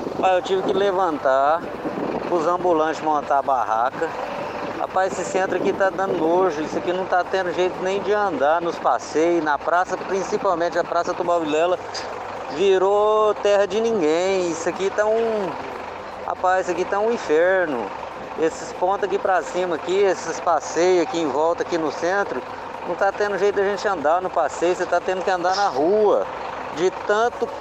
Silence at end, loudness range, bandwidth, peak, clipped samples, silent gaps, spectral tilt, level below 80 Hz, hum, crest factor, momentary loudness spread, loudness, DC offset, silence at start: 0 s; 2 LU; 9.2 kHz; -6 dBFS; under 0.1%; none; -4.5 dB/octave; -56 dBFS; none; 16 dB; 9 LU; -21 LUFS; under 0.1%; 0 s